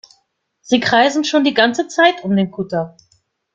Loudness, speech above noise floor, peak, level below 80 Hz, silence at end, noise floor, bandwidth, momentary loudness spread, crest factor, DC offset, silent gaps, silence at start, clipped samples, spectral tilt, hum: -15 LUFS; 49 dB; -2 dBFS; -60 dBFS; 0.65 s; -65 dBFS; 9 kHz; 9 LU; 16 dB; under 0.1%; none; 0.7 s; under 0.1%; -4.5 dB/octave; none